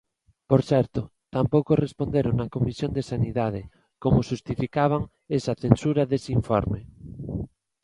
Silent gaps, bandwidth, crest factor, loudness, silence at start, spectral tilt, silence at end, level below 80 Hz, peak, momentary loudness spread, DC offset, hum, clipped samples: none; 11 kHz; 24 dB; -25 LUFS; 0.5 s; -8 dB/octave; 0.35 s; -44 dBFS; 0 dBFS; 12 LU; under 0.1%; none; under 0.1%